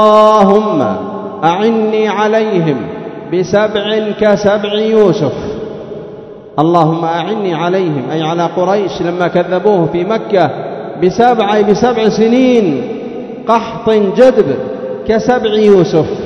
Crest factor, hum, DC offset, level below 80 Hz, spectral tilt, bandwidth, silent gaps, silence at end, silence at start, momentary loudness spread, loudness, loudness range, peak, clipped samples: 12 dB; none; under 0.1%; -46 dBFS; -6.5 dB/octave; 7.8 kHz; none; 0 s; 0 s; 13 LU; -12 LUFS; 3 LU; 0 dBFS; 0.8%